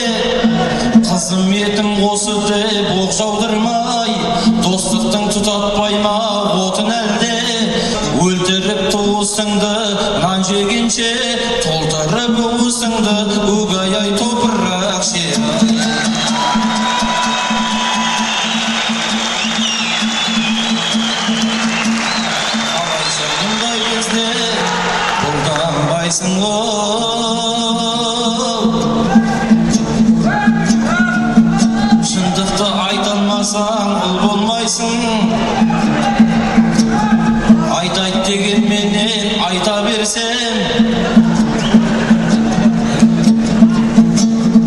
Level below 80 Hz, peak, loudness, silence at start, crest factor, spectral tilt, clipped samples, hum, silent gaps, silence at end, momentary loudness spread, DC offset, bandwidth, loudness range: -36 dBFS; 0 dBFS; -14 LUFS; 0 s; 14 dB; -4 dB/octave; under 0.1%; none; none; 0 s; 3 LU; under 0.1%; 12 kHz; 2 LU